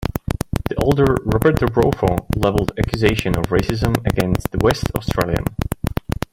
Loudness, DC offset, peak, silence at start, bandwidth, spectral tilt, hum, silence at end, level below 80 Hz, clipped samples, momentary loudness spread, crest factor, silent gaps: -19 LUFS; under 0.1%; 0 dBFS; 0 s; 17 kHz; -6.5 dB/octave; none; 0.4 s; -30 dBFS; under 0.1%; 8 LU; 18 dB; none